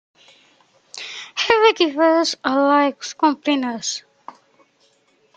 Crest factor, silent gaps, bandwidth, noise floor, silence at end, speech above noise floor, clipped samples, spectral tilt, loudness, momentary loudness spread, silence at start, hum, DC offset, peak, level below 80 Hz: 20 dB; none; 9.2 kHz; -60 dBFS; 1.35 s; 42 dB; under 0.1%; -2 dB/octave; -18 LUFS; 16 LU; 0.95 s; none; under 0.1%; 0 dBFS; -66 dBFS